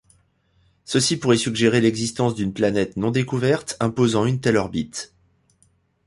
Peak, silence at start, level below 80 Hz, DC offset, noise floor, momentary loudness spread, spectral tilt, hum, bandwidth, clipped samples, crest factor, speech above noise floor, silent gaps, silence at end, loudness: -4 dBFS; 0.9 s; -52 dBFS; under 0.1%; -62 dBFS; 8 LU; -5 dB/octave; none; 11.5 kHz; under 0.1%; 18 dB; 42 dB; none; 1 s; -21 LUFS